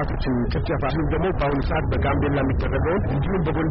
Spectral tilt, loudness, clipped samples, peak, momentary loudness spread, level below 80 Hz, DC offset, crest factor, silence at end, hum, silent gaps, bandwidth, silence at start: -7 dB/octave; -23 LUFS; under 0.1%; -12 dBFS; 2 LU; -28 dBFS; under 0.1%; 8 dB; 0 s; none; none; 5.8 kHz; 0 s